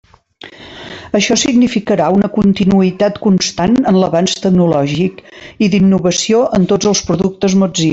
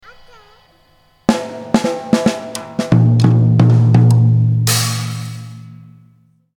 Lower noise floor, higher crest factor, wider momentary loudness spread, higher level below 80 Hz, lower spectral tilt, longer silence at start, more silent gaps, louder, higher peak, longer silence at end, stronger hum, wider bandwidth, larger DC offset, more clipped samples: second, -38 dBFS vs -53 dBFS; about the same, 12 dB vs 14 dB; second, 7 LU vs 14 LU; first, -42 dBFS vs -48 dBFS; about the same, -5 dB/octave vs -6 dB/octave; second, 0.45 s vs 1.3 s; neither; about the same, -12 LUFS vs -14 LUFS; about the same, -2 dBFS vs 0 dBFS; second, 0 s vs 0.8 s; neither; second, 8 kHz vs 18.5 kHz; neither; neither